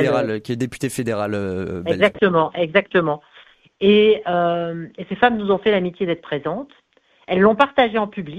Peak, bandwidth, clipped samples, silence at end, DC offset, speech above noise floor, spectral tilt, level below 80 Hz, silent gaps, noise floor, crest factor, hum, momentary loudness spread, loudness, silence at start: 0 dBFS; 14 kHz; under 0.1%; 0 s; under 0.1%; 32 dB; -6 dB/octave; -54 dBFS; none; -51 dBFS; 18 dB; none; 11 LU; -19 LUFS; 0 s